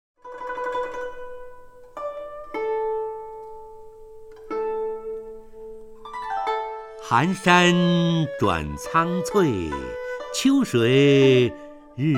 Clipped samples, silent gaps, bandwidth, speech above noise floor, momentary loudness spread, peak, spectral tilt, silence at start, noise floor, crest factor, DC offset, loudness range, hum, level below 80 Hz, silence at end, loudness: under 0.1%; none; 15 kHz; 23 dB; 24 LU; -2 dBFS; -5.5 dB/octave; 0.25 s; -43 dBFS; 22 dB; under 0.1%; 12 LU; none; -48 dBFS; 0 s; -22 LUFS